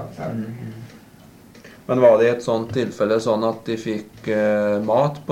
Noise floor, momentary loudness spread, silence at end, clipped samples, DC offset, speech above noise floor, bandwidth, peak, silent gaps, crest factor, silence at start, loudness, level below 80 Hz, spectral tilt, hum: -46 dBFS; 17 LU; 0 s; under 0.1%; under 0.1%; 26 dB; 16 kHz; -4 dBFS; none; 18 dB; 0 s; -20 LUFS; -58 dBFS; -6.5 dB/octave; none